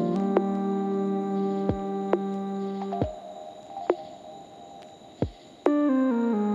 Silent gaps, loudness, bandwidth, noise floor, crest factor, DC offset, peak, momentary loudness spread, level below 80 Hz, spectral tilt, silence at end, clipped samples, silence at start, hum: none; -28 LUFS; 7.6 kHz; -47 dBFS; 20 dB; under 0.1%; -8 dBFS; 21 LU; -52 dBFS; -8.5 dB/octave; 0 s; under 0.1%; 0 s; none